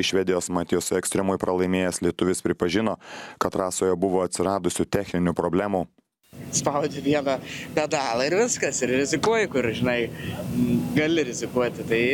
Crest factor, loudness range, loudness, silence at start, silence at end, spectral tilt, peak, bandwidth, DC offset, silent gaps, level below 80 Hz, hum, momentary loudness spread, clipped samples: 18 dB; 2 LU; -24 LUFS; 0 s; 0 s; -4.5 dB/octave; -6 dBFS; 18 kHz; under 0.1%; none; -54 dBFS; none; 6 LU; under 0.1%